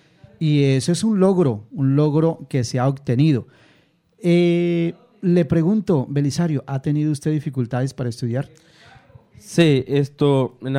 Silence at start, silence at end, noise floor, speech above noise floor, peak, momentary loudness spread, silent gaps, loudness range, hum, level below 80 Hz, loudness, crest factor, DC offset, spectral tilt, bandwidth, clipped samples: 0.4 s; 0 s; -58 dBFS; 39 dB; -4 dBFS; 9 LU; none; 4 LU; none; -56 dBFS; -20 LUFS; 16 dB; under 0.1%; -7 dB/octave; 12 kHz; under 0.1%